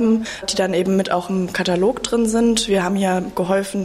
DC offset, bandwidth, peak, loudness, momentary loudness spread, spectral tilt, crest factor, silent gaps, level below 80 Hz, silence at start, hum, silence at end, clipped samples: under 0.1%; 15.5 kHz; -6 dBFS; -19 LUFS; 4 LU; -4.5 dB/octave; 12 dB; none; -46 dBFS; 0 s; none; 0 s; under 0.1%